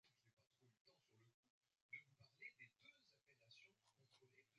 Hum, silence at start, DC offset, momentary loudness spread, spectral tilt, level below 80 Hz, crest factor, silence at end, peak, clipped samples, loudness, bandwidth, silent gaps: none; 0.05 s; under 0.1%; 9 LU; -1 dB/octave; under -90 dBFS; 24 dB; 0 s; -46 dBFS; under 0.1%; -63 LUFS; 7.6 kHz; 0.33-0.37 s, 0.47-0.51 s, 0.81-0.85 s, 1.34-1.43 s, 1.50-1.61 s, 1.82-1.89 s